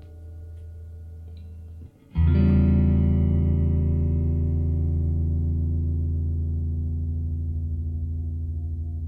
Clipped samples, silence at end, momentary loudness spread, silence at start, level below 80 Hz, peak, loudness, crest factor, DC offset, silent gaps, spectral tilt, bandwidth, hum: under 0.1%; 0 s; 21 LU; 0 s; -28 dBFS; -8 dBFS; -24 LUFS; 14 dB; under 0.1%; none; -12 dB/octave; 3.2 kHz; none